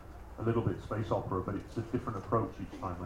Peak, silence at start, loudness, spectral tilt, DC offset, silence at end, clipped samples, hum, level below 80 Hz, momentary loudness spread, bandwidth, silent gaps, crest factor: -18 dBFS; 0 s; -35 LUFS; -8.5 dB/octave; under 0.1%; 0 s; under 0.1%; none; -52 dBFS; 7 LU; 12 kHz; none; 18 dB